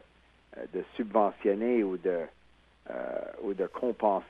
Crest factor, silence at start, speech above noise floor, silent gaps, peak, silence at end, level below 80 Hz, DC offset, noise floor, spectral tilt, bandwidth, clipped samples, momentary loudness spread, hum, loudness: 20 dB; 0.5 s; 32 dB; none; -10 dBFS; 0 s; -66 dBFS; under 0.1%; -62 dBFS; -8.5 dB/octave; 5 kHz; under 0.1%; 15 LU; none; -31 LUFS